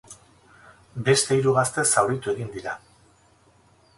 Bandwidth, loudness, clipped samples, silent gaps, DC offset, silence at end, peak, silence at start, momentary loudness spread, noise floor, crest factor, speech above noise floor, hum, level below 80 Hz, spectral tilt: 11.5 kHz; -22 LUFS; under 0.1%; none; under 0.1%; 1.2 s; -4 dBFS; 0.1 s; 15 LU; -58 dBFS; 20 dB; 36 dB; none; -58 dBFS; -3.5 dB/octave